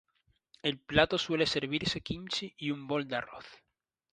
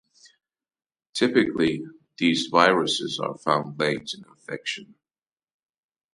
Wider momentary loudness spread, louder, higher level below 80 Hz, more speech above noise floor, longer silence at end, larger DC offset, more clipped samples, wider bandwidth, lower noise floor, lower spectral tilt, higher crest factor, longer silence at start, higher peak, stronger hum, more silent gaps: second, 10 LU vs 17 LU; second, -32 LUFS vs -24 LUFS; first, -56 dBFS vs -66 dBFS; second, 35 dB vs over 66 dB; second, 0.6 s vs 1.3 s; neither; neither; about the same, 10.5 kHz vs 11.5 kHz; second, -67 dBFS vs under -90 dBFS; about the same, -4.5 dB/octave vs -4 dB/octave; about the same, 26 dB vs 24 dB; second, 0.65 s vs 1.15 s; second, -8 dBFS vs -2 dBFS; neither; neither